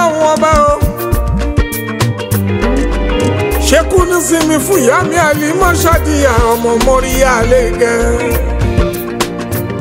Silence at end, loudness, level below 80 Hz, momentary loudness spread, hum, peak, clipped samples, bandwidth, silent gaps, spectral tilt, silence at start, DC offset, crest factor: 0 s; -12 LUFS; -18 dBFS; 6 LU; none; 0 dBFS; under 0.1%; 16.5 kHz; none; -5 dB/octave; 0 s; under 0.1%; 10 dB